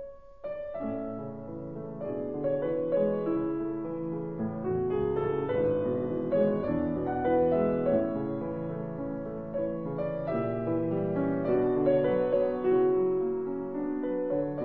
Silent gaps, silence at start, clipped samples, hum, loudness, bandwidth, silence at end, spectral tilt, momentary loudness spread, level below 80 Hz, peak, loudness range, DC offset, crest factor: none; 0 s; under 0.1%; none; -30 LUFS; 4.3 kHz; 0 s; -11.5 dB/octave; 10 LU; -56 dBFS; -12 dBFS; 5 LU; 0.2%; 16 dB